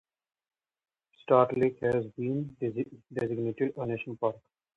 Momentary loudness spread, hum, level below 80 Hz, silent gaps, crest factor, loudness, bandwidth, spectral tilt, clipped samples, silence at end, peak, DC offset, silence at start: 12 LU; none; -66 dBFS; none; 22 dB; -30 LUFS; 7.4 kHz; -9 dB/octave; under 0.1%; 0.4 s; -8 dBFS; under 0.1%; 1.3 s